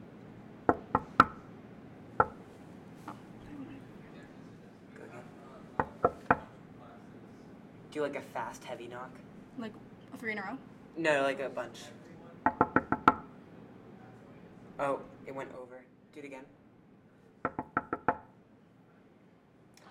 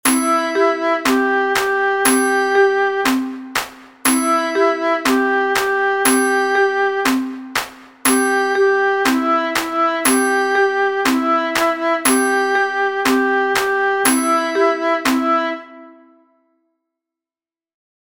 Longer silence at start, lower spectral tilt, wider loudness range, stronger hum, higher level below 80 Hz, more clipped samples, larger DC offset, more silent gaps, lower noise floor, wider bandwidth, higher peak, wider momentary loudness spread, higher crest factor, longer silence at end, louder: about the same, 0 s vs 0.05 s; first, -6 dB/octave vs -1.5 dB/octave; first, 10 LU vs 2 LU; neither; second, -64 dBFS vs -56 dBFS; neither; neither; neither; second, -61 dBFS vs under -90 dBFS; about the same, 16 kHz vs 17 kHz; second, -6 dBFS vs 0 dBFS; first, 24 LU vs 5 LU; first, 32 dB vs 18 dB; second, 0 s vs 2.1 s; second, -33 LUFS vs -16 LUFS